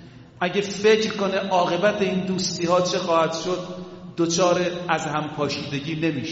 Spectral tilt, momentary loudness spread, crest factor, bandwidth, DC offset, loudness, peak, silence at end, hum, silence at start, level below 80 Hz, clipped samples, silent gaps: -4 dB/octave; 8 LU; 18 dB; 8 kHz; under 0.1%; -23 LUFS; -6 dBFS; 0 s; none; 0 s; -60 dBFS; under 0.1%; none